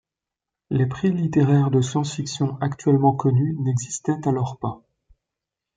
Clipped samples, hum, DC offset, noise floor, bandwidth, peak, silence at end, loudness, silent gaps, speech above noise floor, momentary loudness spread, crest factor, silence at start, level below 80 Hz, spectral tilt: under 0.1%; none; under 0.1%; -87 dBFS; 9.4 kHz; -4 dBFS; 1 s; -22 LUFS; none; 66 dB; 9 LU; 18 dB; 0.7 s; -58 dBFS; -7 dB/octave